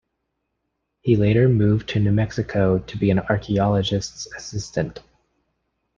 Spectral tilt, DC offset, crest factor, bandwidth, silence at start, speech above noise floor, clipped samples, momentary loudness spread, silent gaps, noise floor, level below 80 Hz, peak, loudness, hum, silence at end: -7 dB/octave; under 0.1%; 18 dB; 7.4 kHz; 1.05 s; 56 dB; under 0.1%; 13 LU; none; -76 dBFS; -46 dBFS; -4 dBFS; -21 LUFS; none; 1 s